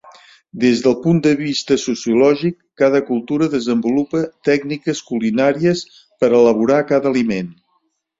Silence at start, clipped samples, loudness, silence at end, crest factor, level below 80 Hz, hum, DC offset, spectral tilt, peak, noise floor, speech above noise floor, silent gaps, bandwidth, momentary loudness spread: 0.05 s; under 0.1%; -17 LUFS; 0.7 s; 14 dB; -58 dBFS; none; under 0.1%; -6 dB/octave; -2 dBFS; -66 dBFS; 50 dB; none; 7.8 kHz; 9 LU